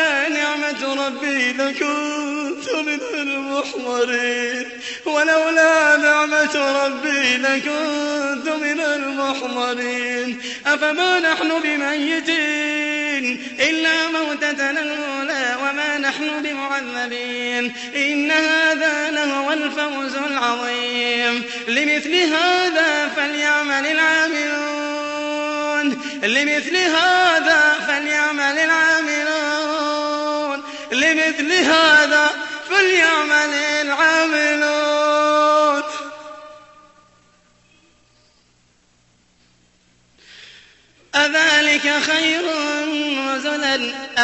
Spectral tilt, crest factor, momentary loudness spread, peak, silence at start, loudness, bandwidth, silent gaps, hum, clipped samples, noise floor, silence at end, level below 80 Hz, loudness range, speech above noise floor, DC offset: -1 dB/octave; 16 dB; 9 LU; -2 dBFS; 0 s; -18 LUFS; 8.4 kHz; none; none; under 0.1%; -58 dBFS; 0 s; -64 dBFS; 6 LU; 40 dB; under 0.1%